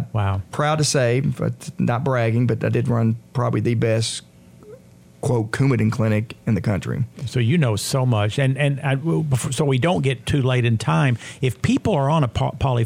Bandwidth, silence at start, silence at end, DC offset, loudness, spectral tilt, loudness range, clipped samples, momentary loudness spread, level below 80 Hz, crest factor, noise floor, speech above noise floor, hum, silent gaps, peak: 15.5 kHz; 0 s; 0 s; under 0.1%; -21 LUFS; -6 dB/octave; 2 LU; under 0.1%; 5 LU; -48 dBFS; 14 dB; -45 dBFS; 26 dB; none; none; -6 dBFS